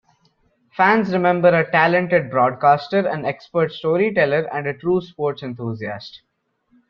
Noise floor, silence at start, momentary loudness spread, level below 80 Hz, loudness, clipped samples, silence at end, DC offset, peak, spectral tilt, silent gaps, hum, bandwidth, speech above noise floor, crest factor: -62 dBFS; 0.75 s; 13 LU; -60 dBFS; -19 LUFS; under 0.1%; 0.75 s; under 0.1%; -2 dBFS; -8 dB/octave; none; none; 6.4 kHz; 44 dB; 18 dB